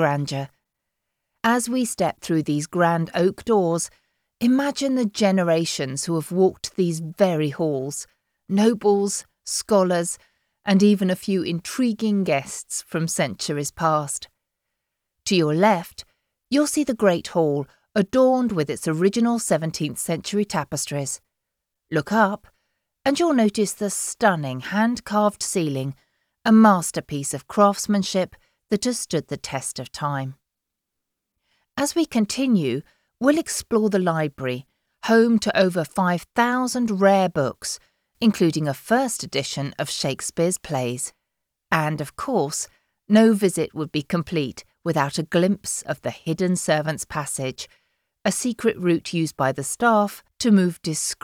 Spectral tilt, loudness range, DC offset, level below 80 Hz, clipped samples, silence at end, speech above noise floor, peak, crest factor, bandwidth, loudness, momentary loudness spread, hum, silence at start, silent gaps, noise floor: -5 dB/octave; 5 LU; under 0.1%; -60 dBFS; under 0.1%; 0.1 s; 61 dB; -4 dBFS; 18 dB; 16.5 kHz; -22 LUFS; 10 LU; none; 0 s; none; -83 dBFS